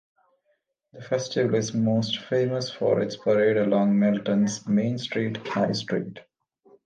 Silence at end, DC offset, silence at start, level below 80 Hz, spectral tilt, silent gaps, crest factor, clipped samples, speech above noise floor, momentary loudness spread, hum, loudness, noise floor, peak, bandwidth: 0.65 s; under 0.1%; 0.95 s; -68 dBFS; -6 dB/octave; none; 14 dB; under 0.1%; 49 dB; 7 LU; none; -25 LUFS; -73 dBFS; -10 dBFS; 9 kHz